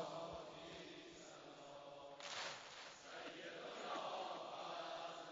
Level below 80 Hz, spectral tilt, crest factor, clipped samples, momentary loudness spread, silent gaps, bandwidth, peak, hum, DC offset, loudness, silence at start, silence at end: -82 dBFS; -1 dB/octave; 16 dB; under 0.1%; 10 LU; none; 7.4 kHz; -36 dBFS; none; under 0.1%; -51 LUFS; 0 s; 0 s